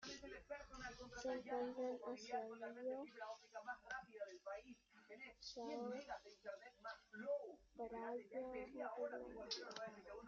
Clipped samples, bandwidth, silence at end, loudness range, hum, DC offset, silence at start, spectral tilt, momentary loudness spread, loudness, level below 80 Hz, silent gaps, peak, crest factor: under 0.1%; 7.6 kHz; 0 s; 4 LU; none; under 0.1%; 0 s; -1.5 dB/octave; 9 LU; -51 LUFS; -76 dBFS; none; -34 dBFS; 18 dB